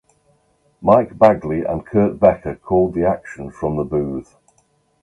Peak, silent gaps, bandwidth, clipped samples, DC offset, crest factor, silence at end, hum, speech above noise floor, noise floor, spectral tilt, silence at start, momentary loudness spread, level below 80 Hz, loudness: 0 dBFS; none; 10.5 kHz; under 0.1%; under 0.1%; 18 dB; 0.8 s; none; 44 dB; -61 dBFS; -9.5 dB/octave; 0.8 s; 12 LU; -42 dBFS; -18 LUFS